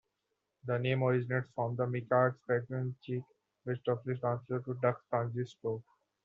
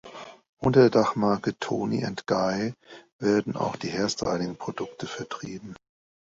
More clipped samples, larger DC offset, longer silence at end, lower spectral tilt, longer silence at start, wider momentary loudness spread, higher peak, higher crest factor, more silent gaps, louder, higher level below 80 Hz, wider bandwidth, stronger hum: neither; neither; second, 0.45 s vs 0.6 s; about the same, -6.5 dB/octave vs -6 dB/octave; first, 0.65 s vs 0.05 s; second, 10 LU vs 19 LU; second, -16 dBFS vs -6 dBFS; about the same, 20 dB vs 20 dB; second, none vs 0.49-0.57 s, 3.12-3.19 s; second, -34 LUFS vs -26 LUFS; second, -74 dBFS vs -60 dBFS; second, 6.8 kHz vs 7.8 kHz; neither